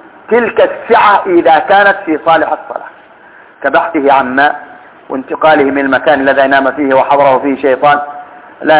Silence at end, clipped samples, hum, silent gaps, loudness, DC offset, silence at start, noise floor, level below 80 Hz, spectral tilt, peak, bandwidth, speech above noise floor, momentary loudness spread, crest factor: 0 s; 2%; none; none; -9 LUFS; under 0.1%; 0.3 s; -38 dBFS; -50 dBFS; -8.5 dB/octave; 0 dBFS; 4 kHz; 29 dB; 12 LU; 10 dB